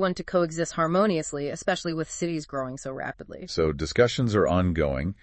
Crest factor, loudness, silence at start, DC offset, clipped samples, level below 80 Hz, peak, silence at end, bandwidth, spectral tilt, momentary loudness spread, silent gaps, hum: 18 dB; -26 LUFS; 0 s; under 0.1%; under 0.1%; -46 dBFS; -6 dBFS; 0.1 s; 8.8 kHz; -5.5 dB/octave; 11 LU; none; none